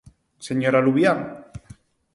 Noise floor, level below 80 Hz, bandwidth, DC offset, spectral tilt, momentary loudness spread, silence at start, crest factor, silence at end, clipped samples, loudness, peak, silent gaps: -49 dBFS; -56 dBFS; 11.5 kHz; under 0.1%; -6.5 dB/octave; 23 LU; 0.4 s; 18 dB; 0.55 s; under 0.1%; -20 LUFS; -6 dBFS; none